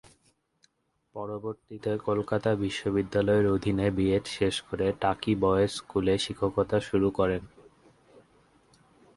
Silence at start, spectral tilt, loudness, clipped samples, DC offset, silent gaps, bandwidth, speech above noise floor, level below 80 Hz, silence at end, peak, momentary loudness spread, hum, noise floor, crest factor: 1.15 s; -6 dB/octave; -28 LUFS; under 0.1%; under 0.1%; none; 11.5 kHz; 46 dB; -50 dBFS; 1.7 s; -10 dBFS; 11 LU; none; -74 dBFS; 18 dB